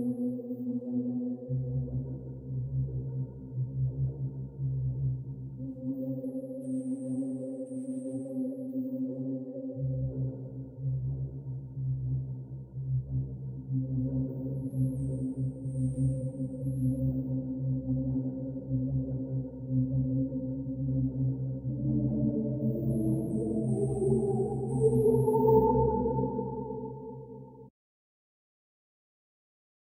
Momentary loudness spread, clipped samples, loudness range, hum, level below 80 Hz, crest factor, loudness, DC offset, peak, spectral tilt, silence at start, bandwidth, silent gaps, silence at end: 10 LU; under 0.1%; 8 LU; none; -50 dBFS; 20 dB; -32 LUFS; under 0.1%; -12 dBFS; -12 dB/octave; 0 s; 11.5 kHz; none; 2.3 s